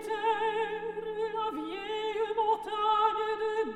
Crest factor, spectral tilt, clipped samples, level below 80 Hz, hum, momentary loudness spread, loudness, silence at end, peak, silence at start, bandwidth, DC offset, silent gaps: 16 dB; -4 dB/octave; under 0.1%; -64 dBFS; none; 8 LU; -31 LUFS; 0 s; -14 dBFS; 0 s; 12 kHz; under 0.1%; none